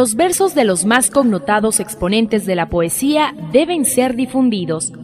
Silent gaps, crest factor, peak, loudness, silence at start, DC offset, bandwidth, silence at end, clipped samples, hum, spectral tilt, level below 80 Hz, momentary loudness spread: none; 16 dB; 0 dBFS; -15 LUFS; 0 s; under 0.1%; 15.5 kHz; 0 s; under 0.1%; none; -3.5 dB/octave; -42 dBFS; 4 LU